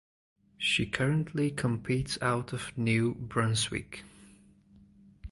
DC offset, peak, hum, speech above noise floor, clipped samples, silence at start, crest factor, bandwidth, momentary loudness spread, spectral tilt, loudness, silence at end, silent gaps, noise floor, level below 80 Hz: under 0.1%; -12 dBFS; none; 28 dB; under 0.1%; 0.6 s; 20 dB; 11.5 kHz; 9 LU; -5 dB/octave; -30 LUFS; 0 s; none; -59 dBFS; -54 dBFS